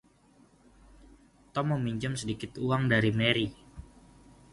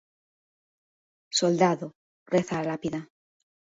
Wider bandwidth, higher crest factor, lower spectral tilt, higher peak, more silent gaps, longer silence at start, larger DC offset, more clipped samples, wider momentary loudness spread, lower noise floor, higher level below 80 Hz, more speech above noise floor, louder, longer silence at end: first, 11.5 kHz vs 7.8 kHz; about the same, 24 dB vs 22 dB; about the same, -5.5 dB/octave vs -4.5 dB/octave; about the same, -8 dBFS vs -8 dBFS; second, none vs 1.95-2.26 s; first, 1.55 s vs 1.3 s; neither; neither; first, 18 LU vs 12 LU; second, -62 dBFS vs under -90 dBFS; first, -56 dBFS vs -68 dBFS; second, 33 dB vs over 64 dB; about the same, -29 LUFS vs -27 LUFS; about the same, 0.7 s vs 0.7 s